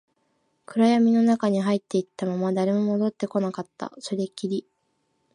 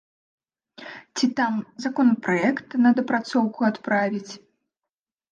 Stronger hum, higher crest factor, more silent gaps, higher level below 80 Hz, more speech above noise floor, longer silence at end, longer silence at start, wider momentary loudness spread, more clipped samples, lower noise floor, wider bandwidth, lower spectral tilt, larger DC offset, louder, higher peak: neither; about the same, 16 dB vs 18 dB; neither; about the same, -76 dBFS vs -74 dBFS; second, 49 dB vs 66 dB; second, 0.75 s vs 0.95 s; about the same, 0.7 s vs 0.8 s; second, 12 LU vs 20 LU; neither; second, -72 dBFS vs -88 dBFS; first, 10.5 kHz vs 8.8 kHz; first, -7 dB/octave vs -5.5 dB/octave; neither; about the same, -24 LUFS vs -23 LUFS; about the same, -8 dBFS vs -8 dBFS